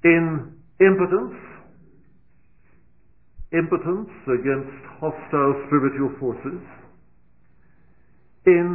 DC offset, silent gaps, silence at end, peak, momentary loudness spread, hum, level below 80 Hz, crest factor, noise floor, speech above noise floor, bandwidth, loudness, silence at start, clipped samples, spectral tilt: 0.3%; none; 0 s; -2 dBFS; 17 LU; none; -52 dBFS; 20 dB; -61 dBFS; 40 dB; 3 kHz; -22 LUFS; 0.05 s; under 0.1%; -12 dB/octave